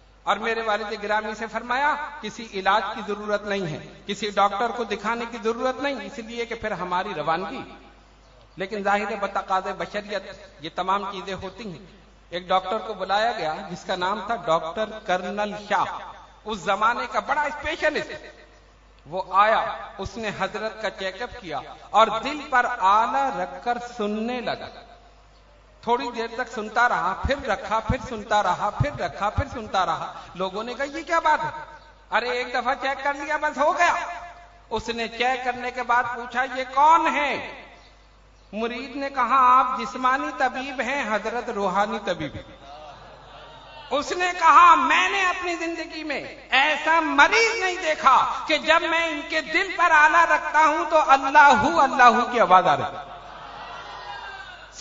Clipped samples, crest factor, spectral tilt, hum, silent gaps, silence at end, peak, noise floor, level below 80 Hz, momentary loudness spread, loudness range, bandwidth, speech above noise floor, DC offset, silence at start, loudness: under 0.1%; 22 dB; -4 dB/octave; none; none; 0 s; -2 dBFS; -52 dBFS; -48 dBFS; 18 LU; 10 LU; 7.8 kHz; 29 dB; under 0.1%; 0.25 s; -22 LUFS